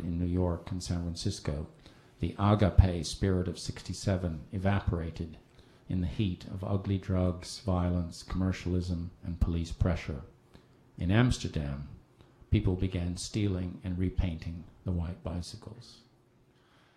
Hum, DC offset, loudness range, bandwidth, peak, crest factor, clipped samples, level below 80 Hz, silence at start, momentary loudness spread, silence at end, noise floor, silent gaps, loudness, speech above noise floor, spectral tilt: none; under 0.1%; 4 LU; 11.5 kHz; -6 dBFS; 26 dB; under 0.1%; -40 dBFS; 0 s; 13 LU; 1 s; -64 dBFS; none; -32 LUFS; 33 dB; -6.5 dB/octave